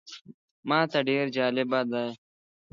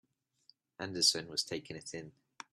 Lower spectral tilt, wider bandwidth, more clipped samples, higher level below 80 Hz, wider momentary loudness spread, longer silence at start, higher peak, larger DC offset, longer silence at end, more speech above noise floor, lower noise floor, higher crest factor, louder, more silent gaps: first, -6 dB/octave vs -1.5 dB/octave; second, 7.4 kHz vs 13.5 kHz; neither; about the same, -78 dBFS vs -76 dBFS; second, 16 LU vs 21 LU; second, 0.05 s vs 0.8 s; first, -10 dBFS vs -16 dBFS; neither; about the same, 0.55 s vs 0.45 s; first, over 64 dB vs 33 dB; first, under -90 dBFS vs -70 dBFS; about the same, 20 dB vs 24 dB; first, -27 LUFS vs -33 LUFS; first, 0.21-0.25 s, 0.34-0.63 s vs none